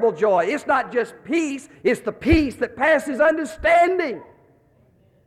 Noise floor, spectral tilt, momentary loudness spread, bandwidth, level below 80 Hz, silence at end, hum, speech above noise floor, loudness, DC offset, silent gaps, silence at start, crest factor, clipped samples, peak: -57 dBFS; -5.5 dB/octave; 8 LU; 13.5 kHz; -40 dBFS; 1 s; none; 37 dB; -20 LUFS; under 0.1%; none; 0 s; 18 dB; under 0.1%; -4 dBFS